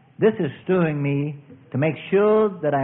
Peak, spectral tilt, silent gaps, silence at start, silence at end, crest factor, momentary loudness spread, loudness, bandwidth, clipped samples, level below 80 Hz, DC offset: -6 dBFS; -12.5 dB/octave; none; 0.2 s; 0 s; 14 dB; 11 LU; -22 LUFS; 3.9 kHz; under 0.1%; -62 dBFS; under 0.1%